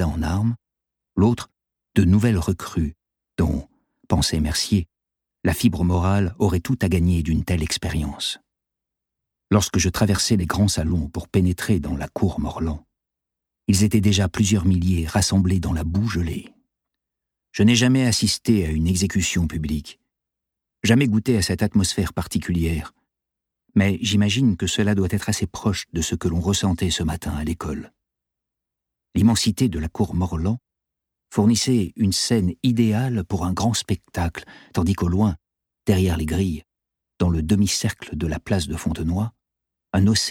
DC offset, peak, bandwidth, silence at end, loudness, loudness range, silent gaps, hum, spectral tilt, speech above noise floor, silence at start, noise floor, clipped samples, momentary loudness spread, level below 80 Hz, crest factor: under 0.1%; -2 dBFS; 17 kHz; 0 s; -22 LUFS; 3 LU; none; none; -5 dB/octave; 65 dB; 0 s; -85 dBFS; under 0.1%; 9 LU; -36 dBFS; 20 dB